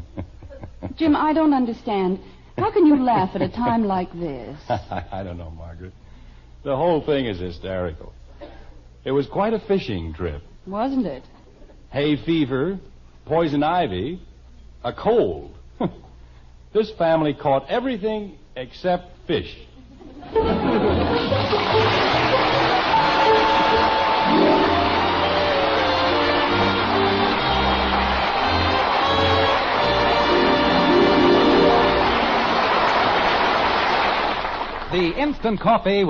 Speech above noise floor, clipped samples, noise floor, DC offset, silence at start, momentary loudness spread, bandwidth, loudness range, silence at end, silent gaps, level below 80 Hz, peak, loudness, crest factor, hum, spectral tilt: 24 dB; under 0.1%; -45 dBFS; under 0.1%; 0 s; 15 LU; 7.2 kHz; 10 LU; 0 s; none; -40 dBFS; -6 dBFS; -20 LUFS; 16 dB; none; -6.5 dB/octave